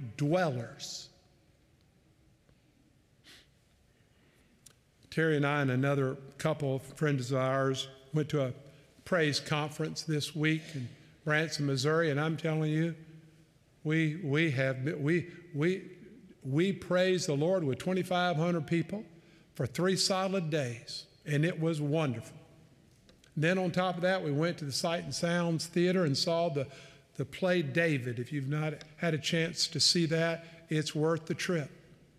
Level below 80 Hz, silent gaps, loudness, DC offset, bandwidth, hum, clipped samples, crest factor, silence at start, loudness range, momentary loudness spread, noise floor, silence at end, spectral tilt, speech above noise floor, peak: -70 dBFS; none; -31 LUFS; under 0.1%; 14.5 kHz; none; under 0.1%; 18 dB; 0 s; 3 LU; 13 LU; -66 dBFS; 0.5 s; -5 dB/octave; 36 dB; -14 dBFS